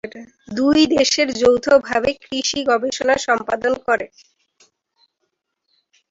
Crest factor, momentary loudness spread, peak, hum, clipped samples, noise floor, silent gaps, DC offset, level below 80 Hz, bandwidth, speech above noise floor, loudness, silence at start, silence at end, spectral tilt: 18 dB; 8 LU; -2 dBFS; none; under 0.1%; -74 dBFS; none; under 0.1%; -52 dBFS; 7.8 kHz; 56 dB; -17 LUFS; 0.05 s; 2.05 s; -2.5 dB/octave